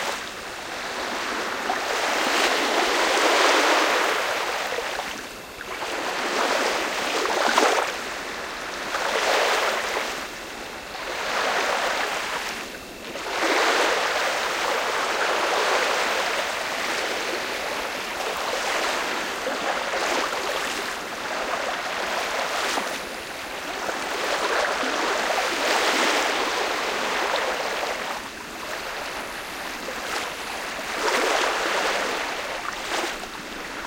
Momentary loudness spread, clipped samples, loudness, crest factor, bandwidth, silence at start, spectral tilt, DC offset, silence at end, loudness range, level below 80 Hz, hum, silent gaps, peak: 11 LU; under 0.1%; -24 LUFS; 22 dB; 17 kHz; 0 s; -1 dB/octave; under 0.1%; 0 s; 6 LU; -56 dBFS; none; none; -4 dBFS